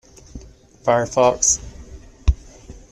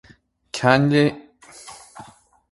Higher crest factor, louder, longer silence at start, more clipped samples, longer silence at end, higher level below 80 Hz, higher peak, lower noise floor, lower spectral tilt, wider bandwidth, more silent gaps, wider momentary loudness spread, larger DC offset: about the same, 20 dB vs 22 dB; about the same, -19 LUFS vs -18 LUFS; second, 0.35 s vs 0.55 s; neither; second, 0.2 s vs 0.5 s; first, -30 dBFS vs -58 dBFS; about the same, -2 dBFS vs 0 dBFS; second, -42 dBFS vs -54 dBFS; second, -3.5 dB/octave vs -6 dB/octave; about the same, 12.5 kHz vs 11.5 kHz; neither; second, 18 LU vs 25 LU; neither